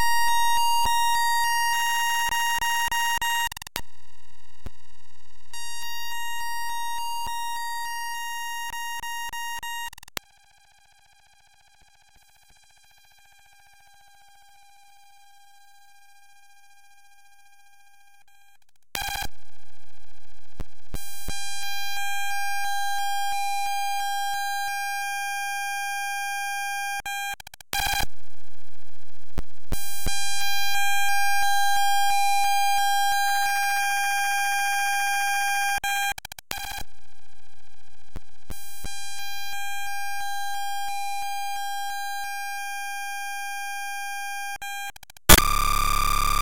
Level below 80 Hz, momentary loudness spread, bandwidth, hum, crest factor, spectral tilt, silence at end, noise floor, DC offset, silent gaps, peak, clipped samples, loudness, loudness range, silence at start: -40 dBFS; 14 LU; 17 kHz; none; 24 dB; -1 dB/octave; 0 s; -64 dBFS; under 0.1%; none; 0 dBFS; under 0.1%; -26 LUFS; 15 LU; 0 s